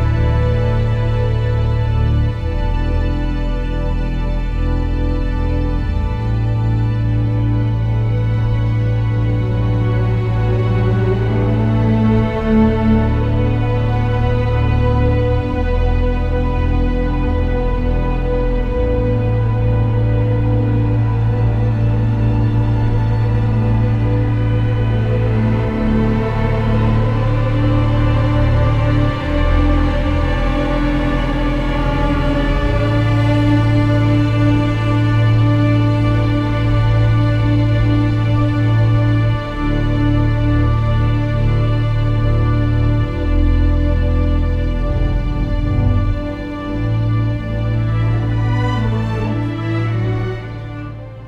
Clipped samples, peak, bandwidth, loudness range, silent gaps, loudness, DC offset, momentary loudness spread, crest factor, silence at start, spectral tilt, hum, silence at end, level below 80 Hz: under 0.1%; -2 dBFS; 5.6 kHz; 4 LU; none; -17 LUFS; under 0.1%; 5 LU; 12 dB; 0 s; -9 dB/octave; none; 0 s; -20 dBFS